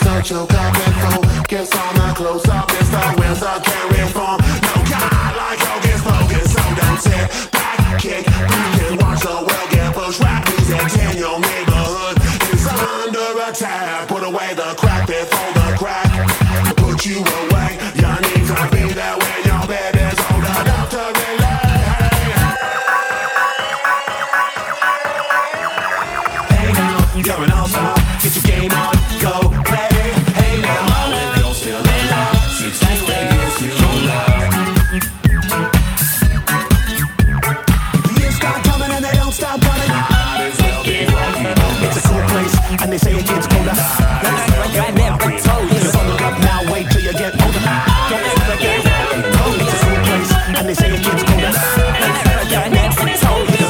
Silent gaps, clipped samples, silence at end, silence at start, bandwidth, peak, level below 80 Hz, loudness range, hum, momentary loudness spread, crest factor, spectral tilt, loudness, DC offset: none; under 0.1%; 0 s; 0 s; over 20 kHz; 0 dBFS; -22 dBFS; 2 LU; none; 4 LU; 14 dB; -4.5 dB/octave; -15 LUFS; under 0.1%